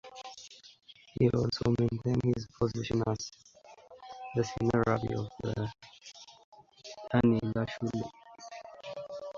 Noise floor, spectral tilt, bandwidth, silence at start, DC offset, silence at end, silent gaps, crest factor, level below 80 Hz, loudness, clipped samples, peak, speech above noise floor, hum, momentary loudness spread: -55 dBFS; -7 dB/octave; 7.6 kHz; 0.05 s; under 0.1%; 0 s; 6.44-6.52 s; 20 dB; -54 dBFS; -32 LUFS; under 0.1%; -12 dBFS; 24 dB; none; 22 LU